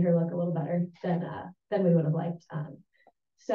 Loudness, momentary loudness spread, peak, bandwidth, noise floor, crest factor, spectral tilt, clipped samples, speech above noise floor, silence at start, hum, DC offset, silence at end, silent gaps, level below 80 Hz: -30 LUFS; 15 LU; -14 dBFS; 6.6 kHz; -66 dBFS; 16 dB; -10 dB/octave; under 0.1%; 38 dB; 0 s; none; under 0.1%; 0 s; none; -74 dBFS